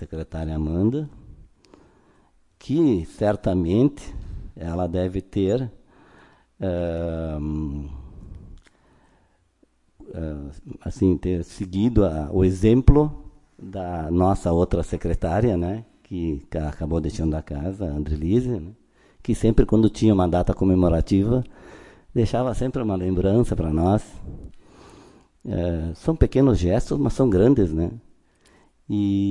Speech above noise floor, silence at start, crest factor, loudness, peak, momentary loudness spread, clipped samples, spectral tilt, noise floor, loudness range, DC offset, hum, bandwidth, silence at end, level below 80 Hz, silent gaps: 41 dB; 0 s; 22 dB; -23 LUFS; -2 dBFS; 18 LU; under 0.1%; -8.5 dB/octave; -62 dBFS; 9 LU; under 0.1%; none; 11.5 kHz; 0 s; -34 dBFS; none